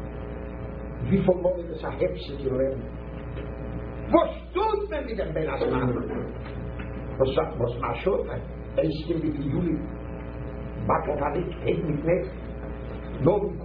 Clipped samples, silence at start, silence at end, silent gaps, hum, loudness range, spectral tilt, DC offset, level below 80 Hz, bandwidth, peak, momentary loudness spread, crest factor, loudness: under 0.1%; 0 s; 0 s; none; none; 1 LU; -11 dB/octave; under 0.1%; -38 dBFS; 5.2 kHz; -6 dBFS; 13 LU; 22 dB; -28 LUFS